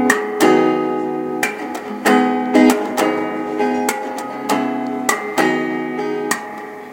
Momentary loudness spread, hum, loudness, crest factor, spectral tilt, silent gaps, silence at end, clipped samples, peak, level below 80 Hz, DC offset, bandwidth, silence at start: 10 LU; none; -18 LUFS; 18 dB; -4 dB/octave; none; 0 s; under 0.1%; 0 dBFS; -66 dBFS; under 0.1%; 17 kHz; 0 s